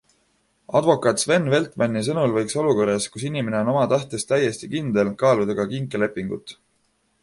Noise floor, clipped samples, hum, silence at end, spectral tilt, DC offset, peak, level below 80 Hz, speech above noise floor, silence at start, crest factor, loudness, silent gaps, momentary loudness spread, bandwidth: -67 dBFS; under 0.1%; none; 0.7 s; -5 dB/octave; under 0.1%; -2 dBFS; -58 dBFS; 46 dB; 0.7 s; 20 dB; -22 LUFS; none; 7 LU; 11.5 kHz